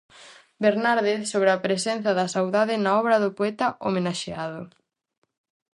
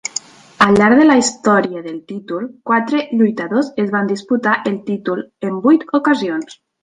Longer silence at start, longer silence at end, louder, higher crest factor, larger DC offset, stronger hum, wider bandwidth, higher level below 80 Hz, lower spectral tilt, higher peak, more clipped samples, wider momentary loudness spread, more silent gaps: second, 0.2 s vs 0.6 s; first, 1.05 s vs 0.3 s; second, -23 LUFS vs -15 LUFS; about the same, 18 dB vs 16 dB; neither; neither; about the same, 11.5 kHz vs 10.5 kHz; second, -68 dBFS vs -54 dBFS; about the same, -4.5 dB/octave vs -5 dB/octave; second, -6 dBFS vs 0 dBFS; neither; second, 9 LU vs 15 LU; neither